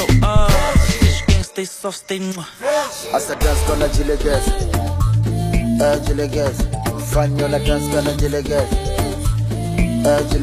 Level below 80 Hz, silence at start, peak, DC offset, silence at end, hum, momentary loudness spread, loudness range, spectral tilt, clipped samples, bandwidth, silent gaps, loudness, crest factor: -22 dBFS; 0 s; -2 dBFS; under 0.1%; 0 s; none; 8 LU; 2 LU; -5.5 dB/octave; under 0.1%; 15 kHz; none; -18 LUFS; 14 dB